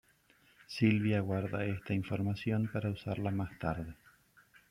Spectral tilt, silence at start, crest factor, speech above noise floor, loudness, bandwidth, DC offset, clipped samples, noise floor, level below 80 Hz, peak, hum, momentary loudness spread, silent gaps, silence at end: -8 dB/octave; 0.7 s; 20 dB; 34 dB; -35 LUFS; 12 kHz; under 0.1%; under 0.1%; -67 dBFS; -62 dBFS; -16 dBFS; none; 8 LU; none; 0.75 s